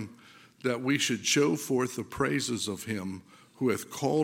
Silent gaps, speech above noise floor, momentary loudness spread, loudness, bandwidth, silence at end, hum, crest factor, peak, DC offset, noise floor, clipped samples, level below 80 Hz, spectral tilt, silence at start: none; 26 dB; 10 LU; -29 LUFS; 17 kHz; 0 s; none; 18 dB; -12 dBFS; under 0.1%; -55 dBFS; under 0.1%; -64 dBFS; -4 dB/octave; 0 s